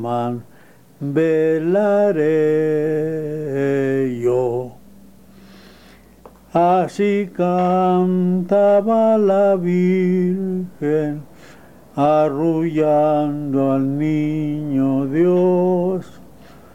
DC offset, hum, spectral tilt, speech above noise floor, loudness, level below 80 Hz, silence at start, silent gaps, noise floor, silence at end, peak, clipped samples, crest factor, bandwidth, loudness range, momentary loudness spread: 0.6%; none; -9 dB/octave; 29 dB; -18 LUFS; -56 dBFS; 0 s; none; -46 dBFS; 0.5 s; -6 dBFS; under 0.1%; 12 dB; 15 kHz; 6 LU; 8 LU